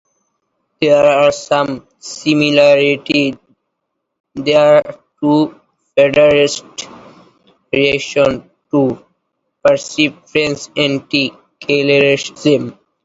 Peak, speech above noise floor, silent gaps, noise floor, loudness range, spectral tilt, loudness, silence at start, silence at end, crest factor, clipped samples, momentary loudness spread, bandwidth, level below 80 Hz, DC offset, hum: 0 dBFS; 60 dB; 4.20-4.24 s; -73 dBFS; 3 LU; -4.5 dB/octave; -13 LUFS; 0.8 s; 0.35 s; 14 dB; under 0.1%; 15 LU; 8 kHz; -52 dBFS; under 0.1%; none